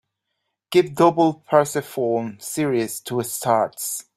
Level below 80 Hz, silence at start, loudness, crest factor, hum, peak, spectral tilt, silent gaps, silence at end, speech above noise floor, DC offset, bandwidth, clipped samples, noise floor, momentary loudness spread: -64 dBFS; 0.7 s; -21 LUFS; 20 dB; none; -2 dBFS; -5 dB/octave; none; 0.15 s; 57 dB; under 0.1%; 16 kHz; under 0.1%; -78 dBFS; 9 LU